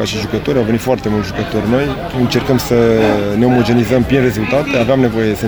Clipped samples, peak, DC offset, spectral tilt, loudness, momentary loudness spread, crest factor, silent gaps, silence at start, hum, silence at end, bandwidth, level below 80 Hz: under 0.1%; 0 dBFS; under 0.1%; -6.5 dB/octave; -14 LUFS; 6 LU; 14 dB; none; 0 s; none; 0 s; over 20 kHz; -34 dBFS